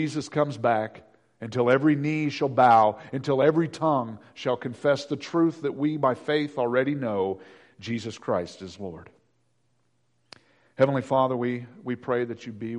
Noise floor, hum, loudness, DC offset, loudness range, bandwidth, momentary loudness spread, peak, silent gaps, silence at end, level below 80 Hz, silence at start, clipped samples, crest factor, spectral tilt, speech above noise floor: -72 dBFS; none; -25 LUFS; under 0.1%; 9 LU; 10.5 kHz; 15 LU; -8 dBFS; none; 0 s; -68 dBFS; 0 s; under 0.1%; 18 dB; -7 dB/octave; 47 dB